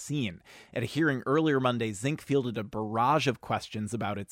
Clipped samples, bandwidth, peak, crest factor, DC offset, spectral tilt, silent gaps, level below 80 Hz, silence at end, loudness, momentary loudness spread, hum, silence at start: under 0.1%; 16 kHz; -14 dBFS; 16 dB; under 0.1%; -5.5 dB/octave; none; -64 dBFS; 0.05 s; -29 LUFS; 10 LU; none; 0 s